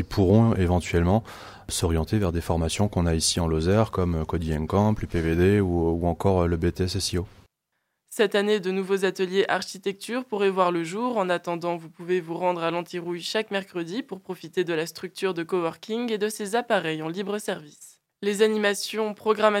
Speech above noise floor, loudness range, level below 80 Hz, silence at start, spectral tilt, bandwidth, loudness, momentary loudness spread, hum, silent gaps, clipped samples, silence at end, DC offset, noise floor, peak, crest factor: 54 dB; 5 LU; -46 dBFS; 0 s; -5.5 dB/octave; 16.5 kHz; -25 LUFS; 10 LU; none; none; under 0.1%; 0 s; under 0.1%; -78 dBFS; -4 dBFS; 20 dB